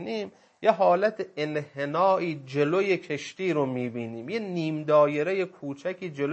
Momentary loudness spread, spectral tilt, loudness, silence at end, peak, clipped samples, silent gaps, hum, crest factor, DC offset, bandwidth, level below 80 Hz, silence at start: 12 LU; -6.5 dB/octave; -27 LUFS; 0 s; -8 dBFS; under 0.1%; none; none; 20 dB; under 0.1%; 8.4 kHz; -78 dBFS; 0 s